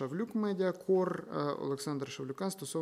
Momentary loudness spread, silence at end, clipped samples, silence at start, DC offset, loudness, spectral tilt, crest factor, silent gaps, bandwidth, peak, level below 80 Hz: 7 LU; 0 s; under 0.1%; 0 s; under 0.1%; -35 LUFS; -6 dB/octave; 16 dB; none; 15.5 kHz; -20 dBFS; -80 dBFS